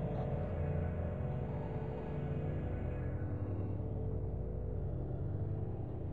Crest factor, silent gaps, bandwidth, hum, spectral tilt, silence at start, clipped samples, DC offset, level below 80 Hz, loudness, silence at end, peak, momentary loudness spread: 12 dB; none; 3.9 kHz; none; -11 dB/octave; 0 s; under 0.1%; 0.3%; -46 dBFS; -40 LUFS; 0 s; -26 dBFS; 3 LU